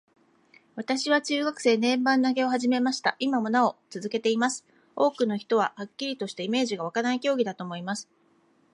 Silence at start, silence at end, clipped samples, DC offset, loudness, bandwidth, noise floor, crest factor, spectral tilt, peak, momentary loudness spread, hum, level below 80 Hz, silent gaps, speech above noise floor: 0.75 s; 0.7 s; under 0.1%; under 0.1%; -26 LUFS; 11 kHz; -64 dBFS; 18 dB; -4 dB/octave; -8 dBFS; 11 LU; none; -80 dBFS; none; 38 dB